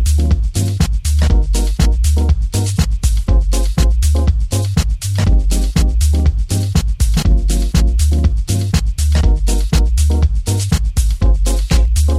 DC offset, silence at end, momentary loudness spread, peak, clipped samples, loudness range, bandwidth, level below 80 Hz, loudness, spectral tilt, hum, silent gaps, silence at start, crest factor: under 0.1%; 0 s; 3 LU; 0 dBFS; under 0.1%; 1 LU; 15 kHz; -14 dBFS; -16 LUFS; -5.5 dB/octave; none; none; 0 s; 12 dB